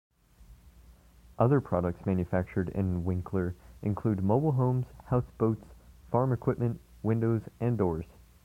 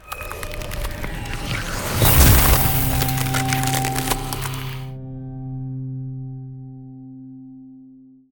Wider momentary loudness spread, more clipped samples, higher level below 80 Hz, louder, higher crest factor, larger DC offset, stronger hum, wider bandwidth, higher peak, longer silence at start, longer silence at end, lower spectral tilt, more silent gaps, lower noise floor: second, 7 LU vs 25 LU; neither; second, -52 dBFS vs -28 dBFS; second, -30 LUFS vs -20 LUFS; about the same, 20 dB vs 22 dB; neither; neither; second, 5 kHz vs over 20 kHz; second, -10 dBFS vs 0 dBFS; first, 0.4 s vs 0.05 s; about the same, 0.4 s vs 0.35 s; first, -10.5 dB/octave vs -4 dB/octave; neither; first, -56 dBFS vs -46 dBFS